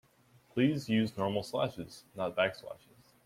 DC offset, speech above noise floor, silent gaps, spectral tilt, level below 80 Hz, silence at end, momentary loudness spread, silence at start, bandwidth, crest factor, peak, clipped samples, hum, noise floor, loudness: under 0.1%; 32 dB; none; -6.5 dB/octave; -68 dBFS; 0.5 s; 16 LU; 0.55 s; 16 kHz; 18 dB; -16 dBFS; under 0.1%; none; -65 dBFS; -33 LUFS